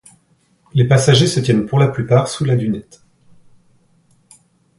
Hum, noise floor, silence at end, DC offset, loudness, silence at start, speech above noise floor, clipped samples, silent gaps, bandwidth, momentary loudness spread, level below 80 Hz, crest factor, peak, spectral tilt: none; -58 dBFS; 1.95 s; under 0.1%; -15 LUFS; 0.75 s; 44 dB; under 0.1%; none; 11.5 kHz; 9 LU; -50 dBFS; 16 dB; 0 dBFS; -6 dB/octave